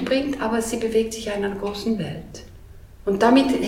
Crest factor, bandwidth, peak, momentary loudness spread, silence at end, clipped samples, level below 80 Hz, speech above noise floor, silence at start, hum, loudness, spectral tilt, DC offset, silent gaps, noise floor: 18 dB; 16 kHz; -4 dBFS; 15 LU; 0 s; under 0.1%; -46 dBFS; 21 dB; 0 s; none; -22 LUFS; -5 dB/octave; under 0.1%; none; -43 dBFS